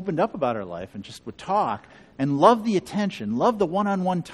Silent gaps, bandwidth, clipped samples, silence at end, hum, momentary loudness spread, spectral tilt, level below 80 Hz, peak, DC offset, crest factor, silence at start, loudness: none; 13 kHz; under 0.1%; 0 s; none; 18 LU; -7 dB/octave; -60 dBFS; -2 dBFS; under 0.1%; 22 dB; 0 s; -23 LUFS